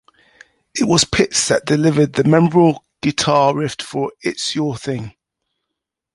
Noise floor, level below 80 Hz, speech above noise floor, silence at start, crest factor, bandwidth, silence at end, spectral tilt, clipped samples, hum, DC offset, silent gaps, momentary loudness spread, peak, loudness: -80 dBFS; -46 dBFS; 64 dB; 0.75 s; 16 dB; 11.5 kHz; 1.05 s; -4.5 dB/octave; under 0.1%; none; under 0.1%; none; 11 LU; 0 dBFS; -16 LUFS